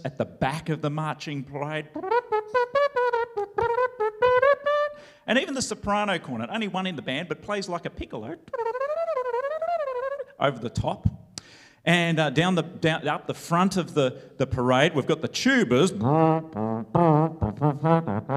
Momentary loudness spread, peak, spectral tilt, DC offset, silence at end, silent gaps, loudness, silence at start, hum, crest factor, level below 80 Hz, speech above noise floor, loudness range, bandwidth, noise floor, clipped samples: 10 LU; -4 dBFS; -5.5 dB/octave; under 0.1%; 0 s; none; -25 LUFS; 0 s; none; 20 dB; -52 dBFS; 20 dB; 7 LU; 13 kHz; -45 dBFS; under 0.1%